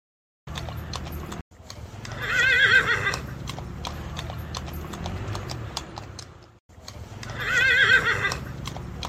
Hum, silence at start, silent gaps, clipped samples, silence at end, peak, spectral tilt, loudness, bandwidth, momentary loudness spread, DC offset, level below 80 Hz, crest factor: none; 0.45 s; 1.41-1.51 s, 6.60-6.69 s; under 0.1%; 0 s; -6 dBFS; -3 dB/octave; -23 LUFS; 16 kHz; 23 LU; under 0.1%; -42 dBFS; 22 dB